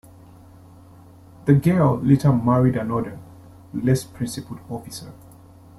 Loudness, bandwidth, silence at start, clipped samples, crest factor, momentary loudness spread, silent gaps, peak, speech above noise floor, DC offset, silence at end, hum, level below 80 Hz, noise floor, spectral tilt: -20 LUFS; 13.5 kHz; 1.45 s; under 0.1%; 20 dB; 17 LU; none; -4 dBFS; 27 dB; under 0.1%; 0.65 s; none; -50 dBFS; -46 dBFS; -8 dB/octave